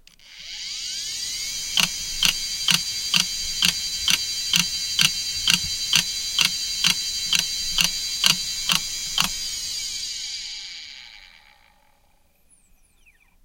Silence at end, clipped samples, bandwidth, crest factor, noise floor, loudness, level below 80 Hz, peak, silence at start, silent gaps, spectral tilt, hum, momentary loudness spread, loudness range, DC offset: 2.05 s; under 0.1%; 17 kHz; 26 dB; -60 dBFS; -21 LUFS; -46 dBFS; 0 dBFS; 0.2 s; none; 0.5 dB/octave; none; 10 LU; 11 LU; under 0.1%